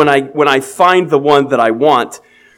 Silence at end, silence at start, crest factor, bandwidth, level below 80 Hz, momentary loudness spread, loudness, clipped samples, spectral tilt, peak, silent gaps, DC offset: 0.4 s; 0 s; 12 dB; 16.5 kHz; -58 dBFS; 3 LU; -11 LUFS; 0.3%; -5 dB/octave; 0 dBFS; none; under 0.1%